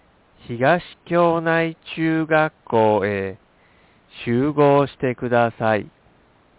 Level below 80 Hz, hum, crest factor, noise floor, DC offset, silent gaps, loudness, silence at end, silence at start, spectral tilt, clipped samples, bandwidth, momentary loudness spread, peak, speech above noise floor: -54 dBFS; none; 16 dB; -56 dBFS; under 0.1%; none; -20 LUFS; 0.7 s; 0.5 s; -10.5 dB/octave; under 0.1%; 4 kHz; 8 LU; -6 dBFS; 36 dB